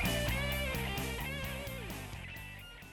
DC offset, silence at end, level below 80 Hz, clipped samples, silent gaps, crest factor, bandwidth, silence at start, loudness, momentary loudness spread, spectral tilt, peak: under 0.1%; 0 s; -44 dBFS; under 0.1%; none; 14 dB; over 20 kHz; 0 s; -38 LUFS; 12 LU; -4 dB/octave; -24 dBFS